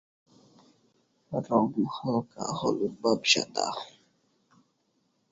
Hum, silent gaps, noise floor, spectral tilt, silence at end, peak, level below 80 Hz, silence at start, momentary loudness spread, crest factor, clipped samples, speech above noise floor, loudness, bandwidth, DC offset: none; none; -73 dBFS; -3.5 dB/octave; 1.45 s; -8 dBFS; -70 dBFS; 1.3 s; 12 LU; 24 dB; under 0.1%; 45 dB; -28 LUFS; 8 kHz; under 0.1%